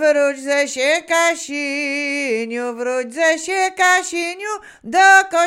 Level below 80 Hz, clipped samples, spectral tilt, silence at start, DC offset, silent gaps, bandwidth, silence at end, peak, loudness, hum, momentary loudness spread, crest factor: -66 dBFS; under 0.1%; -0.5 dB/octave; 0 s; under 0.1%; none; 17 kHz; 0 s; 0 dBFS; -17 LUFS; none; 11 LU; 18 dB